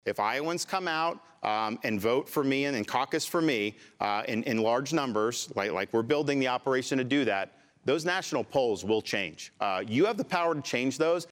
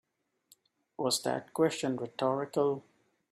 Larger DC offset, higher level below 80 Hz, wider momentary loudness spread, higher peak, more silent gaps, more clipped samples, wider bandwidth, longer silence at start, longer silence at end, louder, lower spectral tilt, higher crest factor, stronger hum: neither; about the same, -74 dBFS vs -78 dBFS; about the same, 5 LU vs 6 LU; first, -12 dBFS vs -16 dBFS; neither; neither; about the same, 17 kHz vs 15.5 kHz; second, 0.05 s vs 1 s; second, 0.05 s vs 0.5 s; first, -29 LUFS vs -32 LUFS; about the same, -4.5 dB/octave vs -4 dB/octave; about the same, 16 dB vs 18 dB; neither